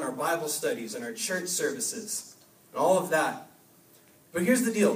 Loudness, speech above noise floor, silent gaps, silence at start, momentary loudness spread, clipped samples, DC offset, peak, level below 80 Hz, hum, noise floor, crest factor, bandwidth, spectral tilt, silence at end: -28 LUFS; 30 dB; none; 0 s; 12 LU; under 0.1%; under 0.1%; -10 dBFS; -76 dBFS; none; -58 dBFS; 18 dB; 15.5 kHz; -3.5 dB/octave; 0 s